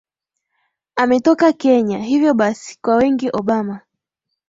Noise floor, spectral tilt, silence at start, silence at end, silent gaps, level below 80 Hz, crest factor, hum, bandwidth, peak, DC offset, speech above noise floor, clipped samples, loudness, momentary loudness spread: -78 dBFS; -6 dB/octave; 0.95 s; 0.7 s; none; -56 dBFS; 16 dB; none; 7.8 kHz; -2 dBFS; under 0.1%; 63 dB; under 0.1%; -16 LUFS; 10 LU